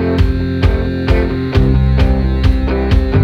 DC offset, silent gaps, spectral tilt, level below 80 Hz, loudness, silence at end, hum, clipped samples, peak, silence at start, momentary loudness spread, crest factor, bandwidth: under 0.1%; none; -8.5 dB/octave; -14 dBFS; -14 LUFS; 0 s; none; under 0.1%; 0 dBFS; 0 s; 3 LU; 12 dB; 6.4 kHz